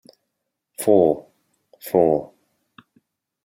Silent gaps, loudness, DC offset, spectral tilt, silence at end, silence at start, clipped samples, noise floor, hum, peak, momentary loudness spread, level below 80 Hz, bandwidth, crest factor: none; -20 LUFS; under 0.1%; -6.5 dB/octave; 1.2 s; 0.8 s; under 0.1%; -79 dBFS; none; -2 dBFS; 18 LU; -62 dBFS; 16.5 kHz; 20 dB